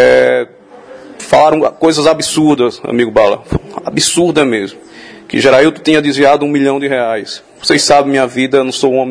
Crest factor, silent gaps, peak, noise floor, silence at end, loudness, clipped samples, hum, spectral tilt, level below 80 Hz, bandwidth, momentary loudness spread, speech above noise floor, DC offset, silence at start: 12 dB; none; 0 dBFS; -35 dBFS; 0 s; -11 LUFS; 0.6%; none; -4 dB/octave; -42 dBFS; 11 kHz; 11 LU; 24 dB; under 0.1%; 0 s